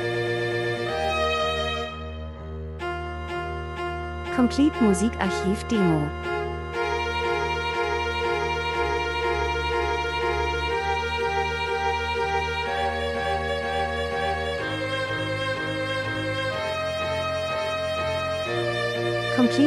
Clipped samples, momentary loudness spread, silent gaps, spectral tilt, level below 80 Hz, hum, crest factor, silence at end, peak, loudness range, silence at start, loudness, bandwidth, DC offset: under 0.1%; 8 LU; none; -5 dB/octave; -40 dBFS; none; 18 dB; 0 s; -8 dBFS; 3 LU; 0 s; -25 LUFS; 14 kHz; under 0.1%